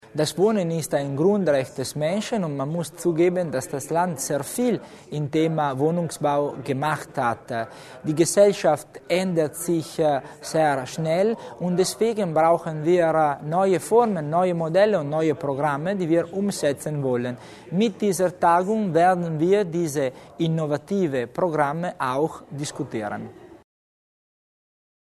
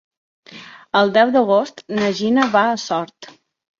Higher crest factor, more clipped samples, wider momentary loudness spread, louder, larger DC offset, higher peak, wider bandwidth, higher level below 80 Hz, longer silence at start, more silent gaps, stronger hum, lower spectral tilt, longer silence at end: about the same, 18 dB vs 18 dB; neither; second, 9 LU vs 14 LU; second, -23 LUFS vs -17 LUFS; neither; about the same, -4 dBFS vs -2 dBFS; first, 13.5 kHz vs 7.4 kHz; about the same, -64 dBFS vs -64 dBFS; second, 0.15 s vs 0.5 s; neither; neither; about the same, -5.5 dB/octave vs -5 dB/octave; first, 1.55 s vs 0.55 s